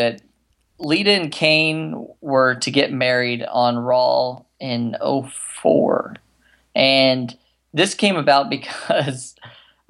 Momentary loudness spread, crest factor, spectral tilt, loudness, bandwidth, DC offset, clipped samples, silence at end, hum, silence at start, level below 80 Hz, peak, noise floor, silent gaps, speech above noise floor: 15 LU; 18 dB; -4 dB/octave; -18 LUFS; 12 kHz; under 0.1%; under 0.1%; 0.4 s; none; 0 s; -68 dBFS; -2 dBFS; -64 dBFS; none; 45 dB